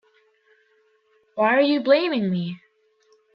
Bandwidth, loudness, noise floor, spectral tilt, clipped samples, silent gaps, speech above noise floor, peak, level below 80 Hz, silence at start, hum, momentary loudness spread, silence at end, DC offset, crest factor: 5.6 kHz; -21 LUFS; -63 dBFS; -8.5 dB/octave; under 0.1%; none; 43 dB; -4 dBFS; -74 dBFS; 1.35 s; none; 17 LU; 0.8 s; under 0.1%; 20 dB